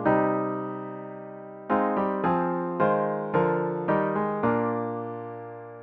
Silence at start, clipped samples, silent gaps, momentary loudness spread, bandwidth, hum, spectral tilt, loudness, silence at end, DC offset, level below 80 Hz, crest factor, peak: 0 s; under 0.1%; none; 15 LU; 4.7 kHz; none; -10.5 dB/octave; -26 LUFS; 0 s; under 0.1%; -62 dBFS; 18 dB; -10 dBFS